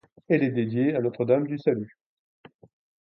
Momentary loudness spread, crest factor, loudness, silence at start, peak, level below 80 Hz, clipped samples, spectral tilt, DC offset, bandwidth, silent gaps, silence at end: 5 LU; 18 dB; -25 LUFS; 0.3 s; -8 dBFS; -70 dBFS; under 0.1%; -11 dB/octave; under 0.1%; 5.8 kHz; none; 1.15 s